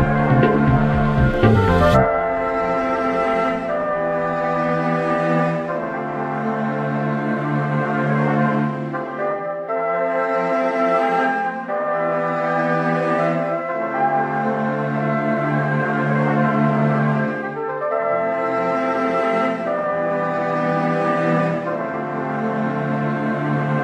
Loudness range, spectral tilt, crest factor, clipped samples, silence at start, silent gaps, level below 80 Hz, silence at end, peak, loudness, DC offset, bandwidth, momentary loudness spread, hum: 3 LU; -8.5 dB/octave; 16 dB; under 0.1%; 0 s; none; -38 dBFS; 0 s; -2 dBFS; -20 LUFS; under 0.1%; 9 kHz; 7 LU; none